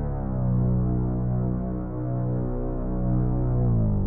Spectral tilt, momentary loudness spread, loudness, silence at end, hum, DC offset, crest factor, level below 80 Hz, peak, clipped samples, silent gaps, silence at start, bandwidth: -15.5 dB/octave; 6 LU; -26 LUFS; 0 s; 60 Hz at -50 dBFS; under 0.1%; 10 dB; -30 dBFS; -14 dBFS; under 0.1%; none; 0 s; 2 kHz